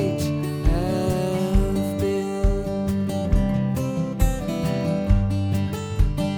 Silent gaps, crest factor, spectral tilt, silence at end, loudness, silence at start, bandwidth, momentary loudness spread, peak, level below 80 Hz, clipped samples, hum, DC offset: none; 16 dB; -7 dB/octave; 0 s; -24 LUFS; 0 s; 19 kHz; 3 LU; -6 dBFS; -26 dBFS; under 0.1%; none; under 0.1%